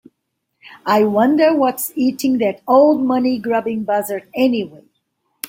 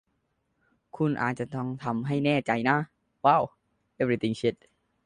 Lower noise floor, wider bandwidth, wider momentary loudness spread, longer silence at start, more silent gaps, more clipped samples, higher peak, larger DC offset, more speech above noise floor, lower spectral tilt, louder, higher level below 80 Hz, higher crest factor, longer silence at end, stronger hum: about the same, -74 dBFS vs -75 dBFS; first, 16.5 kHz vs 10.5 kHz; about the same, 8 LU vs 9 LU; second, 0.65 s vs 0.95 s; neither; neither; first, -2 dBFS vs -8 dBFS; neither; first, 58 dB vs 49 dB; second, -5 dB/octave vs -7 dB/octave; first, -16 LUFS vs -27 LUFS; about the same, -64 dBFS vs -64 dBFS; second, 16 dB vs 22 dB; second, 0 s vs 0.5 s; neither